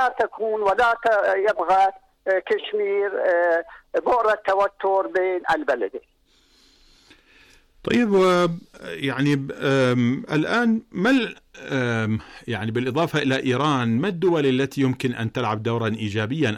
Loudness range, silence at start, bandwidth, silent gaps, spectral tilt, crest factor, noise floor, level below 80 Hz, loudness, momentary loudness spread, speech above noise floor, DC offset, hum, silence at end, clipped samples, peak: 3 LU; 0 s; 14.5 kHz; none; -6.5 dB/octave; 12 dB; -59 dBFS; -58 dBFS; -22 LUFS; 8 LU; 38 dB; under 0.1%; none; 0 s; under 0.1%; -12 dBFS